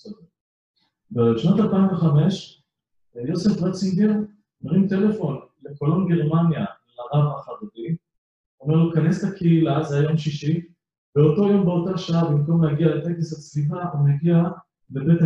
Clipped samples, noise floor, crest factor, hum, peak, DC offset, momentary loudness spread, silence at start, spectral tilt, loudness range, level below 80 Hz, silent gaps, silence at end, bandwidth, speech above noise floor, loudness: under 0.1%; -71 dBFS; 16 dB; none; -6 dBFS; under 0.1%; 13 LU; 0.05 s; -8.5 dB/octave; 3 LU; -58 dBFS; 0.41-0.74 s, 8.18-8.58 s, 10.98-11.13 s; 0 s; 7.8 kHz; 52 dB; -21 LUFS